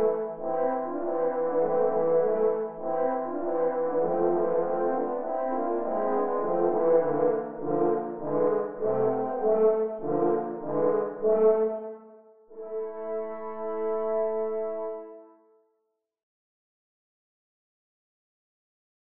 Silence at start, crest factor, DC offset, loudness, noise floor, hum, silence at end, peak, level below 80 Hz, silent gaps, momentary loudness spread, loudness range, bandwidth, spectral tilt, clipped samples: 0 s; 18 dB; 0.7%; -27 LUFS; -78 dBFS; none; 2.9 s; -10 dBFS; -70 dBFS; none; 10 LU; 7 LU; 3 kHz; -9 dB/octave; under 0.1%